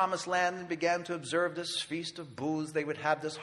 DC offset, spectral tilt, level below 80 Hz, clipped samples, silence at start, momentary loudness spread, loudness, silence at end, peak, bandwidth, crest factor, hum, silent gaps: under 0.1%; -4 dB/octave; -76 dBFS; under 0.1%; 0 s; 7 LU; -33 LUFS; 0 s; -16 dBFS; 12 kHz; 18 dB; none; none